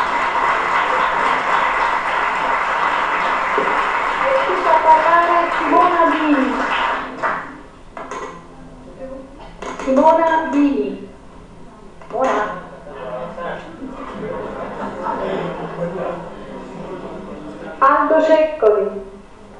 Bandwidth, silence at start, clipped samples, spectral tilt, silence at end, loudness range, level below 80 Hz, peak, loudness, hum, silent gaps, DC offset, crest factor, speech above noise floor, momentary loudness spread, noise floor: 10.5 kHz; 0 s; under 0.1%; -5 dB/octave; 0 s; 11 LU; -46 dBFS; -2 dBFS; -17 LUFS; none; none; under 0.1%; 18 dB; 24 dB; 19 LU; -39 dBFS